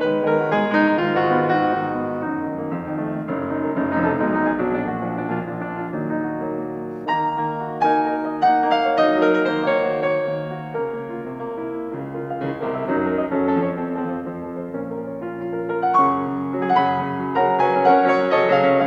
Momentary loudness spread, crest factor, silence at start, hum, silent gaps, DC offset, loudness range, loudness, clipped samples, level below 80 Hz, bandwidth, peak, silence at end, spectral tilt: 12 LU; 16 dB; 0 s; none; none; under 0.1%; 5 LU; -21 LUFS; under 0.1%; -58 dBFS; 7.4 kHz; -4 dBFS; 0 s; -8 dB/octave